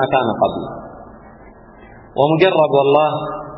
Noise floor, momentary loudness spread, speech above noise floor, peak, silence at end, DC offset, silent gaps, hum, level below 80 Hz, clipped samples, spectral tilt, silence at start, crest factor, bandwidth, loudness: -41 dBFS; 17 LU; 26 dB; 0 dBFS; 0 s; under 0.1%; none; none; -50 dBFS; under 0.1%; -10 dB/octave; 0 s; 16 dB; 5.8 kHz; -15 LUFS